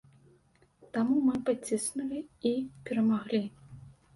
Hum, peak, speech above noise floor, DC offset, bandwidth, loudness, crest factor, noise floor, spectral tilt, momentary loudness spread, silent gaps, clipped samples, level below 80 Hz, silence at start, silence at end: none; -16 dBFS; 35 dB; under 0.1%; 12 kHz; -31 LUFS; 16 dB; -65 dBFS; -5 dB/octave; 11 LU; none; under 0.1%; -68 dBFS; 0.95 s; 0.25 s